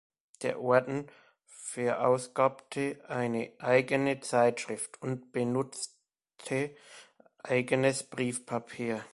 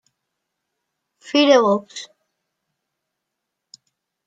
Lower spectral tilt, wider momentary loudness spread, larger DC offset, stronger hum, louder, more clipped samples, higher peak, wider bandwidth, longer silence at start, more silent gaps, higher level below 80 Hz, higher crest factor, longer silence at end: about the same, -5 dB/octave vs -4 dB/octave; second, 12 LU vs 21 LU; neither; neither; second, -31 LUFS vs -16 LUFS; neither; second, -8 dBFS vs -2 dBFS; first, 11.5 kHz vs 9 kHz; second, 0.4 s vs 1.25 s; neither; about the same, -72 dBFS vs -74 dBFS; about the same, 22 dB vs 22 dB; second, 0.05 s vs 2.2 s